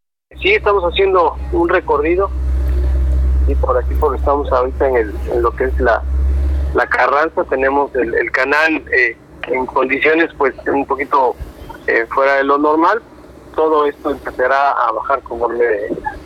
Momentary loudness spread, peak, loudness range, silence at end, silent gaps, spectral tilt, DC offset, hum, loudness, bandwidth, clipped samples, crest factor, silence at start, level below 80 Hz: 6 LU; 0 dBFS; 1 LU; 0 s; none; -7.5 dB/octave; under 0.1%; none; -15 LUFS; 6.6 kHz; under 0.1%; 16 dB; 0.35 s; -22 dBFS